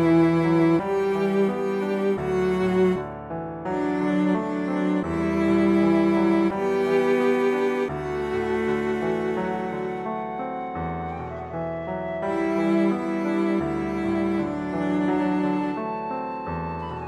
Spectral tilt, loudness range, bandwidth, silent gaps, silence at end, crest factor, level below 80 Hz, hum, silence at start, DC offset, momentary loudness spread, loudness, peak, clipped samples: -8 dB/octave; 6 LU; 11.5 kHz; none; 0 s; 14 dB; -50 dBFS; none; 0 s; under 0.1%; 10 LU; -24 LUFS; -10 dBFS; under 0.1%